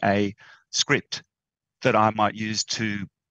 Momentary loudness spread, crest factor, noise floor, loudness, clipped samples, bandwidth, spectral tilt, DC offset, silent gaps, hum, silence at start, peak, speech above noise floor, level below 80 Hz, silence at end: 11 LU; 20 dB; -89 dBFS; -24 LUFS; under 0.1%; 8.6 kHz; -3.5 dB/octave; under 0.1%; none; none; 0 s; -4 dBFS; 65 dB; -66 dBFS; 0.25 s